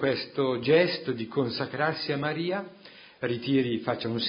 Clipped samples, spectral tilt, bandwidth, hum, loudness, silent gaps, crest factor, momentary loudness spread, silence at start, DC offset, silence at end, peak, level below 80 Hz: under 0.1%; -10 dB/octave; 5.4 kHz; none; -28 LUFS; none; 20 dB; 9 LU; 0 s; under 0.1%; 0 s; -8 dBFS; -66 dBFS